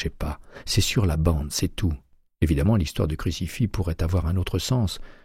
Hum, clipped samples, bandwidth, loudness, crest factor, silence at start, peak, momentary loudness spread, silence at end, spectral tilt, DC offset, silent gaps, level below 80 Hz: none; under 0.1%; 16 kHz; -25 LUFS; 16 dB; 0 s; -8 dBFS; 8 LU; 0.15 s; -5.5 dB/octave; under 0.1%; none; -32 dBFS